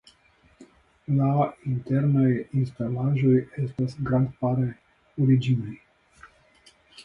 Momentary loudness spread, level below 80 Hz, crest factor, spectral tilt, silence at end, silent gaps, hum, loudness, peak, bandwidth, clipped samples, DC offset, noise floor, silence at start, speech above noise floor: 10 LU; -56 dBFS; 16 dB; -10 dB/octave; 0.05 s; none; none; -25 LUFS; -10 dBFS; 7 kHz; under 0.1%; under 0.1%; -60 dBFS; 0.6 s; 37 dB